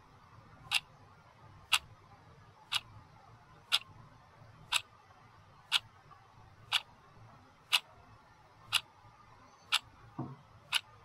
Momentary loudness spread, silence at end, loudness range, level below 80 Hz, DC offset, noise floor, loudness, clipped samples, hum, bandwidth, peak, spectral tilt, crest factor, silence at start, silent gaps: 23 LU; 0.25 s; 2 LU; -70 dBFS; under 0.1%; -60 dBFS; -34 LUFS; under 0.1%; none; 16 kHz; -10 dBFS; -0.5 dB/octave; 30 dB; 0.65 s; none